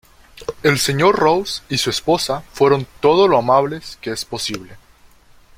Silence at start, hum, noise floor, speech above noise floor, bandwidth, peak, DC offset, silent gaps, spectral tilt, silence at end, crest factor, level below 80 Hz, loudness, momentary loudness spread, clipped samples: 0.4 s; none; -49 dBFS; 32 dB; 16.5 kHz; 0 dBFS; under 0.1%; none; -4.5 dB/octave; 0.8 s; 18 dB; -48 dBFS; -17 LUFS; 13 LU; under 0.1%